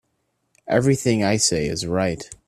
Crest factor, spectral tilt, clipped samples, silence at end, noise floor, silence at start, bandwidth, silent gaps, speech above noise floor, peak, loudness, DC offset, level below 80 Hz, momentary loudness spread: 18 dB; -4.5 dB/octave; under 0.1%; 0.15 s; -72 dBFS; 0.65 s; 14.5 kHz; none; 51 dB; -4 dBFS; -20 LUFS; under 0.1%; -48 dBFS; 5 LU